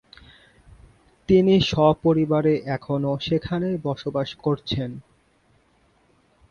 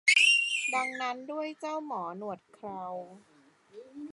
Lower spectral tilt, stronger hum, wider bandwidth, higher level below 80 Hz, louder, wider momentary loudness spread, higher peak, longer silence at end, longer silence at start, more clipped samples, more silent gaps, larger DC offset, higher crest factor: first, -7.5 dB/octave vs -0.5 dB/octave; neither; second, 7.2 kHz vs 11.5 kHz; first, -50 dBFS vs -84 dBFS; first, -22 LUFS vs -28 LUFS; second, 11 LU vs 22 LU; first, -4 dBFS vs -10 dBFS; first, 1.5 s vs 0 s; first, 1.3 s vs 0.05 s; neither; neither; neither; about the same, 18 dB vs 22 dB